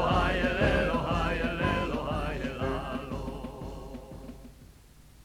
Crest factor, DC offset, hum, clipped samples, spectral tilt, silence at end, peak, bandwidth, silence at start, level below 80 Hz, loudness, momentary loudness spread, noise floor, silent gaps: 18 dB; under 0.1%; none; under 0.1%; -6.5 dB/octave; 0 s; -14 dBFS; 15.5 kHz; 0 s; -38 dBFS; -30 LUFS; 18 LU; -54 dBFS; none